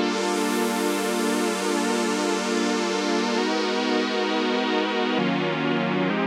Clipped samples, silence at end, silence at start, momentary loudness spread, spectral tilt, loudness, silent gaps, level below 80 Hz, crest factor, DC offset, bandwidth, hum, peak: under 0.1%; 0 s; 0 s; 1 LU; -4 dB/octave; -23 LUFS; none; -84 dBFS; 14 dB; under 0.1%; 16 kHz; none; -10 dBFS